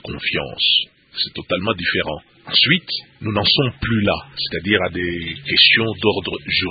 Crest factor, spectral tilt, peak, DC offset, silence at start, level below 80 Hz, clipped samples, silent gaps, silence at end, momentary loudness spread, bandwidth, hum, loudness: 20 dB; -8.5 dB/octave; 0 dBFS; under 0.1%; 0.05 s; -46 dBFS; under 0.1%; none; 0 s; 12 LU; 5.2 kHz; none; -17 LUFS